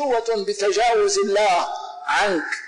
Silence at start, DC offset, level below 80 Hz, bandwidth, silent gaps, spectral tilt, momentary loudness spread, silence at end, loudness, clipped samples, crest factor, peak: 0 s; 0.2%; -56 dBFS; 11.5 kHz; none; -2 dB/octave; 6 LU; 0 s; -20 LUFS; under 0.1%; 8 dB; -12 dBFS